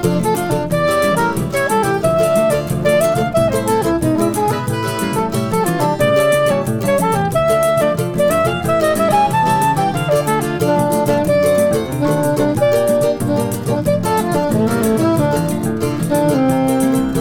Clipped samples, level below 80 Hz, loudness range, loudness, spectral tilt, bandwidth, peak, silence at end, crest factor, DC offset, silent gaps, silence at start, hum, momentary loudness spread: under 0.1%; -40 dBFS; 1 LU; -15 LUFS; -6 dB/octave; 19 kHz; -2 dBFS; 0 s; 12 dB; under 0.1%; none; 0 s; none; 4 LU